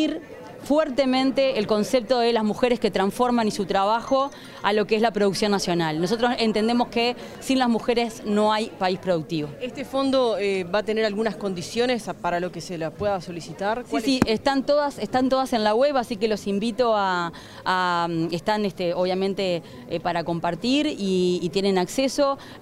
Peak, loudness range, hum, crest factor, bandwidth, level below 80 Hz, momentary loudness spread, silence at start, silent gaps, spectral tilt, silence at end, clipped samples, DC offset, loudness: -4 dBFS; 3 LU; none; 20 dB; 16 kHz; -52 dBFS; 7 LU; 0 s; none; -5 dB/octave; 0 s; under 0.1%; under 0.1%; -23 LUFS